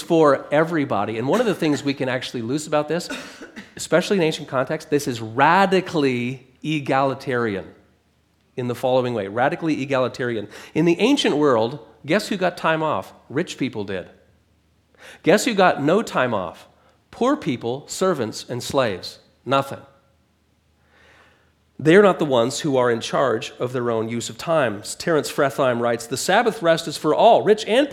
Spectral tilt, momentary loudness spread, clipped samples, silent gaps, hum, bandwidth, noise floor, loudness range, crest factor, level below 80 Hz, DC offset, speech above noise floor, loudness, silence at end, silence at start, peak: -5 dB/octave; 12 LU; under 0.1%; none; none; 16.5 kHz; -62 dBFS; 5 LU; 20 dB; -62 dBFS; under 0.1%; 42 dB; -21 LUFS; 0 s; 0 s; 0 dBFS